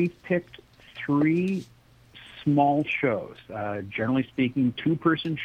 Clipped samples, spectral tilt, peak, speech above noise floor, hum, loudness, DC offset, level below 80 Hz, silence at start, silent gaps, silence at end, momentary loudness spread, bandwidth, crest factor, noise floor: under 0.1%; -8 dB/octave; -8 dBFS; 27 dB; none; -26 LUFS; under 0.1%; -62 dBFS; 0 s; none; 0 s; 11 LU; 9 kHz; 18 dB; -52 dBFS